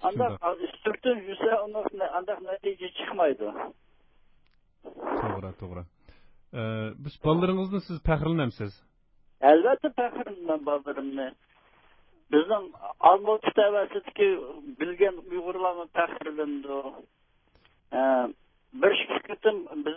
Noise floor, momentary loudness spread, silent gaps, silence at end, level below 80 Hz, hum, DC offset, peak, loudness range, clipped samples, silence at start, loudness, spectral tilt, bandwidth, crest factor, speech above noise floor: -64 dBFS; 13 LU; none; 0 s; -52 dBFS; none; under 0.1%; -4 dBFS; 8 LU; under 0.1%; 0 s; -27 LUFS; -10 dB/octave; 5.8 kHz; 24 dB; 37 dB